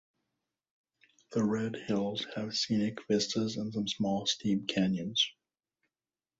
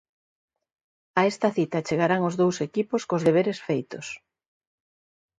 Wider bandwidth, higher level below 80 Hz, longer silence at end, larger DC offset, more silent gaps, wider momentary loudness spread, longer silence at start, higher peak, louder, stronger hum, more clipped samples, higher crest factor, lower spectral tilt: second, 8 kHz vs 10.5 kHz; about the same, -68 dBFS vs -68 dBFS; about the same, 1.1 s vs 1.2 s; neither; neither; second, 4 LU vs 12 LU; first, 1.3 s vs 1.15 s; second, -16 dBFS vs -6 dBFS; second, -32 LUFS vs -25 LUFS; neither; neither; about the same, 18 dB vs 20 dB; second, -4.5 dB/octave vs -6 dB/octave